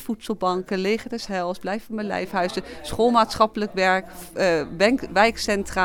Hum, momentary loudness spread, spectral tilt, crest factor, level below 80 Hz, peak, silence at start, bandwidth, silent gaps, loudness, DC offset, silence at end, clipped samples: none; 10 LU; -4.5 dB/octave; 20 dB; -46 dBFS; -4 dBFS; 0 s; 18.5 kHz; none; -23 LUFS; under 0.1%; 0 s; under 0.1%